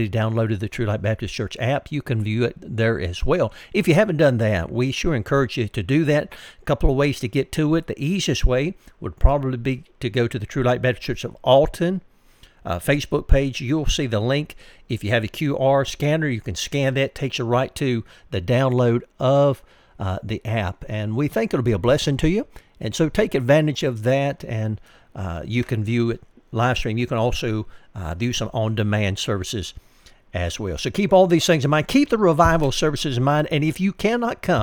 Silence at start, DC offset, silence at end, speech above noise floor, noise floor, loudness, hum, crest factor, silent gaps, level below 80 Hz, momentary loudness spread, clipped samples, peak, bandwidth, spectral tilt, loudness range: 0 s; under 0.1%; 0 s; 31 dB; -51 dBFS; -21 LUFS; none; 20 dB; none; -32 dBFS; 11 LU; under 0.1%; 0 dBFS; 18 kHz; -6 dB/octave; 5 LU